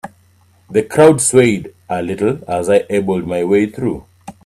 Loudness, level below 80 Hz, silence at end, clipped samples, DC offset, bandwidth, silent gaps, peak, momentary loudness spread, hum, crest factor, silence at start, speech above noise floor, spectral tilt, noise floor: -15 LUFS; -50 dBFS; 0.15 s; under 0.1%; under 0.1%; 14.5 kHz; none; 0 dBFS; 12 LU; none; 16 dB; 0.05 s; 37 dB; -5 dB/octave; -52 dBFS